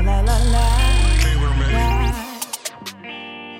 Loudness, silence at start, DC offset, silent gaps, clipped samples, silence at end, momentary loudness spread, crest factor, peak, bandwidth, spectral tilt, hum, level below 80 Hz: -19 LUFS; 0 s; under 0.1%; none; under 0.1%; 0 s; 15 LU; 12 dB; -4 dBFS; 16.5 kHz; -4.5 dB/octave; none; -18 dBFS